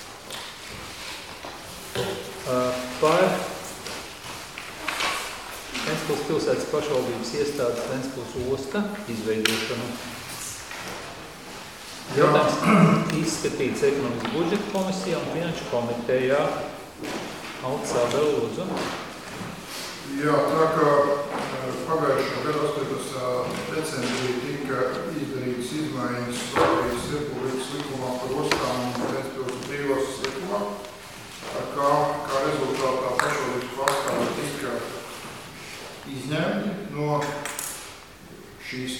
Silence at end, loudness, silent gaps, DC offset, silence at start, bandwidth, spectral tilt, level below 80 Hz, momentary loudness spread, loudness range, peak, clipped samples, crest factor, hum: 0 s; -26 LUFS; none; 0.1%; 0 s; 18 kHz; -4.5 dB/octave; -54 dBFS; 14 LU; 6 LU; 0 dBFS; under 0.1%; 26 dB; none